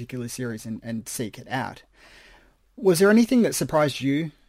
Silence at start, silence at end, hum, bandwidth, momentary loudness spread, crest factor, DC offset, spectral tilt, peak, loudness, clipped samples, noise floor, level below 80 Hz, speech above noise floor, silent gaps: 0 s; 0.2 s; none; 16 kHz; 15 LU; 18 dB; under 0.1%; -5 dB/octave; -6 dBFS; -23 LUFS; under 0.1%; -56 dBFS; -58 dBFS; 32 dB; none